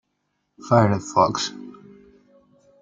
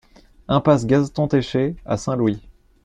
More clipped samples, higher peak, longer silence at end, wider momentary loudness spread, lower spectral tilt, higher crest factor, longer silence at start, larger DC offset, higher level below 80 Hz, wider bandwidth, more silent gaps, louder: neither; about the same, -2 dBFS vs -2 dBFS; first, 1.1 s vs 0.45 s; first, 20 LU vs 7 LU; second, -5.5 dB/octave vs -7 dB/octave; about the same, 22 dB vs 18 dB; first, 0.65 s vs 0.5 s; neither; second, -62 dBFS vs -46 dBFS; about the same, 9 kHz vs 9.6 kHz; neither; about the same, -20 LUFS vs -20 LUFS